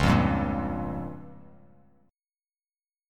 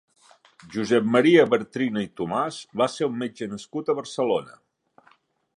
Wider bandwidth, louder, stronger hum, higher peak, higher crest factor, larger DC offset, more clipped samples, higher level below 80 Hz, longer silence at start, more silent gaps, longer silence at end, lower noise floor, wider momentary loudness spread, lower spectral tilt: first, 15 kHz vs 11.5 kHz; second, -28 LUFS vs -24 LUFS; neither; second, -10 dBFS vs -4 dBFS; about the same, 20 dB vs 20 dB; neither; neither; first, -40 dBFS vs -68 dBFS; second, 0 s vs 0.65 s; neither; first, 1.7 s vs 1.05 s; first, under -90 dBFS vs -61 dBFS; first, 21 LU vs 14 LU; first, -7 dB/octave vs -5.5 dB/octave